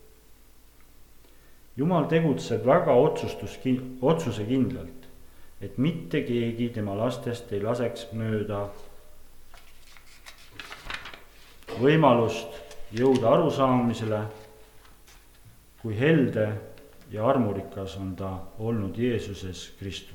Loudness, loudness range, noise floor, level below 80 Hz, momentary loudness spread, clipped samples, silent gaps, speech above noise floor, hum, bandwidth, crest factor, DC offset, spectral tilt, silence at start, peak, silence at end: -26 LUFS; 9 LU; -52 dBFS; -52 dBFS; 18 LU; under 0.1%; none; 27 dB; none; 19 kHz; 22 dB; under 0.1%; -7 dB/octave; 0.3 s; -4 dBFS; 0 s